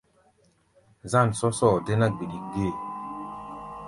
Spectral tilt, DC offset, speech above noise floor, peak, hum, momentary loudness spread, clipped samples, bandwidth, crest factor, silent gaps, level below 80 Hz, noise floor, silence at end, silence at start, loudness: -6.5 dB/octave; under 0.1%; 40 dB; -6 dBFS; none; 16 LU; under 0.1%; 11.5 kHz; 20 dB; none; -52 dBFS; -64 dBFS; 0 s; 1.05 s; -26 LUFS